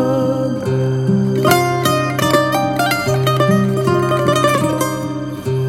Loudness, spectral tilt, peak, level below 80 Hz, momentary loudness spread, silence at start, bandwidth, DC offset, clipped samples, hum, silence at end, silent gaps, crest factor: -16 LUFS; -5.5 dB/octave; 0 dBFS; -46 dBFS; 5 LU; 0 s; 17 kHz; under 0.1%; under 0.1%; none; 0 s; none; 16 dB